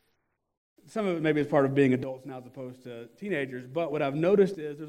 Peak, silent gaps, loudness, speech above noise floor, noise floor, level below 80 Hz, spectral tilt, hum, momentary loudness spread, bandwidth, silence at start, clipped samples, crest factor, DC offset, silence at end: -10 dBFS; none; -27 LUFS; 48 dB; -76 dBFS; -70 dBFS; -7.5 dB/octave; none; 19 LU; 11 kHz; 0.9 s; under 0.1%; 18 dB; under 0.1%; 0 s